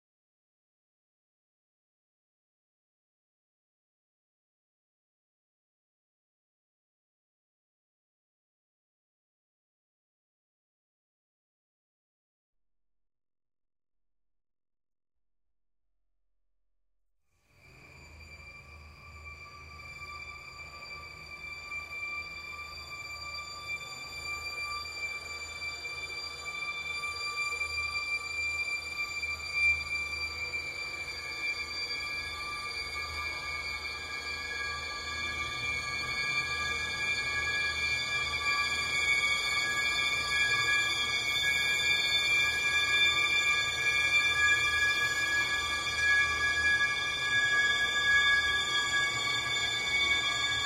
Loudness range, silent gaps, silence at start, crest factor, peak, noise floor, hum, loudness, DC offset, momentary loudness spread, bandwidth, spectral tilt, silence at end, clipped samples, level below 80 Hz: 14 LU; none; 17.65 s; 18 dB; -16 dBFS; under -90 dBFS; none; -29 LUFS; under 0.1%; 16 LU; 16 kHz; -0.5 dB/octave; 0 s; under 0.1%; -56 dBFS